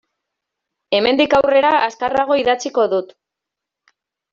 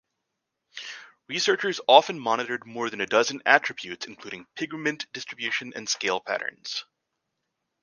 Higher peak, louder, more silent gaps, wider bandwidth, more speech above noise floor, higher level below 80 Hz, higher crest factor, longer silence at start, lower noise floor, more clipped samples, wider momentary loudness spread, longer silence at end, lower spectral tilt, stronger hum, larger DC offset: about the same, -2 dBFS vs 0 dBFS; first, -16 LUFS vs -25 LUFS; neither; second, 7.4 kHz vs 10.5 kHz; first, 68 dB vs 56 dB; first, -54 dBFS vs -76 dBFS; second, 16 dB vs 26 dB; first, 0.9 s vs 0.75 s; about the same, -83 dBFS vs -82 dBFS; neither; second, 6 LU vs 20 LU; first, 1.3 s vs 1 s; first, -3.5 dB/octave vs -2 dB/octave; neither; neither